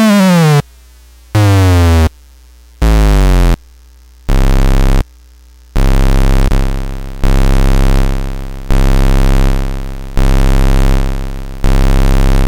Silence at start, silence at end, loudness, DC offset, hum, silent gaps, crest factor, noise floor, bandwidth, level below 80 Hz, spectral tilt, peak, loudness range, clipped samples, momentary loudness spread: 0 s; 0 s; -13 LUFS; under 0.1%; none; none; 8 dB; -39 dBFS; 15.5 kHz; -10 dBFS; -6.5 dB/octave; 0 dBFS; 3 LU; under 0.1%; 13 LU